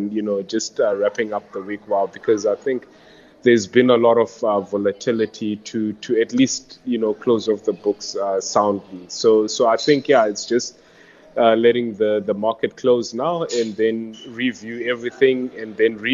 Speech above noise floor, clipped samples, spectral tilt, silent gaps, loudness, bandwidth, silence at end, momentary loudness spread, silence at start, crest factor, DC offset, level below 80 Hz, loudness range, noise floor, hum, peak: 29 dB; under 0.1%; -4.5 dB/octave; none; -20 LUFS; 7.8 kHz; 0 s; 10 LU; 0 s; 18 dB; under 0.1%; -66 dBFS; 3 LU; -48 dBFS; none; -2 dBFS